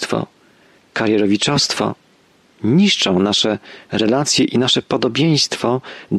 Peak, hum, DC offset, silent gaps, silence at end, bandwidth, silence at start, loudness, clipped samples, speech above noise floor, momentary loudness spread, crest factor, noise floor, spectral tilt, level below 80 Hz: -4 dBFS; none; under 0.1%; none; 0 s; 12.5 kHz; 0 s; -16 LUFS; under 0.1%; 37 dB; 10 LU; 14 dB; -54 dBFS; -4 dB/octave; -56 dBFS